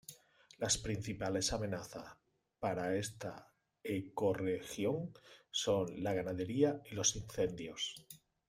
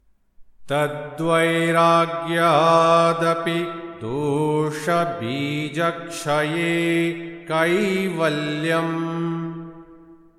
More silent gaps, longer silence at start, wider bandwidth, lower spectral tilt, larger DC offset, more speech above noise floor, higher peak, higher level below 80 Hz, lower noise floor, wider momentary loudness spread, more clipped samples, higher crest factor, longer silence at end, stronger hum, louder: neither; second, 0.1 s vs 0.4 s; first, 16 kHz vs 14 kHz; second, -4 dB/octave vs -5.5 dB/octave; neither; about the same, 25 dB vs 28 dB; second, -18 dBFS vs -4 dBFS; about the same, -62 dBFS vs -60 dBFS; first, -63 dBFS vs -48 dBFS; first, 15 LU vs 10 LU; neither; about the same, 20 dB vs 16 dB; about the same, 0.3 s vs 0.25 s; neither; second, -38 LUFS vs -21 LUFS